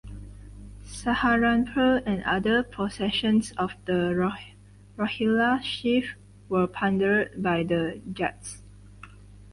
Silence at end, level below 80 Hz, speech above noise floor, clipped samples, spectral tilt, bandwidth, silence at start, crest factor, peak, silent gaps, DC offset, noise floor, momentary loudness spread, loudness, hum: 0 s; -48 dBFS; 22 dB; under 0.1%; -5.5 dB/octave; 11.5 kHz; 0.05 s; 16 dB; -12 dBFS; none; under 0.1%; -47 dBFS; 18 LU; -25 LUFS; 50 Hz at -45 dBFS